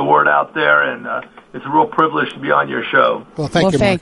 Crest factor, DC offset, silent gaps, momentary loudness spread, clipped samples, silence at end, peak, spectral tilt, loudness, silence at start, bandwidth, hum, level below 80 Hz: 14 dB; under 0.1%; none; 11 LU; under 0.1%; 0 s; 0 dBFS; -5.5 dB/octave; -15 LUFS; 0 s; 11.5 kHz; none; -44 dBFS